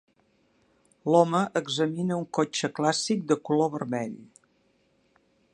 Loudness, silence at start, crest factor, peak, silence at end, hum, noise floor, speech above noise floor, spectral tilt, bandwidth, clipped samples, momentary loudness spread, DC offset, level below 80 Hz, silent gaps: -26 LUFS; 1.05 s; 22 dB; -6 dBFS; 1.3 s; none; -67 dBFS; 42 dB; -5 dB/octave; 11 kHz; under 0.1%; 10 LU; under 0.1%; -74 dBFS; none